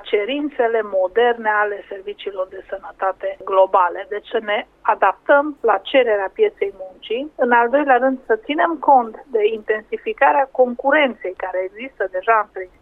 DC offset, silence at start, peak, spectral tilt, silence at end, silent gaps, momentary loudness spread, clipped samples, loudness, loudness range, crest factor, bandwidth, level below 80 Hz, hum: under 0.1%; 0.05 s; -2 dBFS; -6 dB/octave; 0.15 s; none; 12 LU; under 0.1%; -18 LUFS; 3 LU; 16 dB; 4.1 kHz; -58 dBFS; none